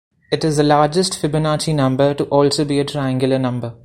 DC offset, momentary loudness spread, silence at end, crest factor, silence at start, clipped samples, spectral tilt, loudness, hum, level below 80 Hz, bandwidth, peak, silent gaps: under 0.1%; 6 LU; 0.1 s; 16 dB; 0.3 s; under 0.1%; -5.5 dB/octave; -17 LUFS; none; -48 dBFS; 14.5 kHz; 0 dBFS; none